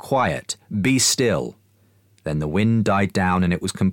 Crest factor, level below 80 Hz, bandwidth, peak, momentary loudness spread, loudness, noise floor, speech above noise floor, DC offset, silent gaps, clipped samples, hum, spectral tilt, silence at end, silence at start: 14 dB; -46 dBFS; 17 kHz; -8 dBFS; 11 LU; -20 LUFS; -58 dBFS; 38 dB; under 0.1%; none; under 0.1%; none; -4.5 dB/octave; 0 s; 0.05 s